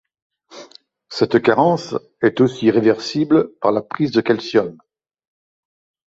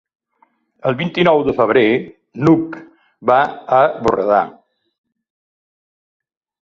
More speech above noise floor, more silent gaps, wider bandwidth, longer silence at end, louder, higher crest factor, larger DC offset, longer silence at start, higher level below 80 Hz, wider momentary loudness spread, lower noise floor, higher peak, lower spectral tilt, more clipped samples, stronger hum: second, 29 dB vs 45 dB; neither; about the same, 7.8 kHz vs 7.4 kHz; second, 1.4 s vs 2.15 s; about the same, -17 LUFS vs -16 LUFS; about the same, 18 dB vs 16 dB; neither; second, 0.55 s vs 0.85 s; about the same, -58 dBFS vs -54 dBFS; second, 7 LU vs 10 LU; second, -46 dBFS vs -59 dBFS; about the same, -2 dBFS vs 0 dBFS; about the same, -6.5 dB/octave vs -7.5 dB/octave; neither; neither